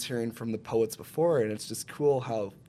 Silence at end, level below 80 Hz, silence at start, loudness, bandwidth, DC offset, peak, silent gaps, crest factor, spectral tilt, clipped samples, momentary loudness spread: 0.15 s; -68 dBFS; 0 s; -30 LUFS; 15.5 kHz; under 0.1%; -14 dBFS; none; 14 dB; -5.5 dB/octave; under 0.1%; 9 LU